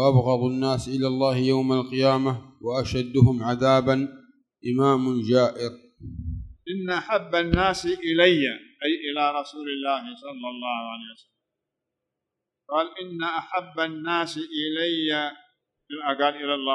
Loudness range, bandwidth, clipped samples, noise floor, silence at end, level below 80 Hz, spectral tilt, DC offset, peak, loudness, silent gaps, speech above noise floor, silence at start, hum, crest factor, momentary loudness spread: 9 LU; 11 kHz; under 0.1%; -85 dBFS; 0 s; -48 dBFS; -6.5 dB/octave; under 0.1%; -4 dBFS; -24 LUFS; none; 61 dB; 0 s; none; 20 dB; 15 LU